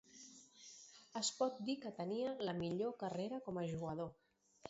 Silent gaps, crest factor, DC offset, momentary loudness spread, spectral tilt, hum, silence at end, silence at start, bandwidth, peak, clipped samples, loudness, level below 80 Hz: none; 18 dB; under 0.1%; 17 LU; -5 dB/octave; none; 0 s; 0.1 s; 7.6 kHz; -26 dBFS; under 0.1%; -43 LUFS; -76 dBFS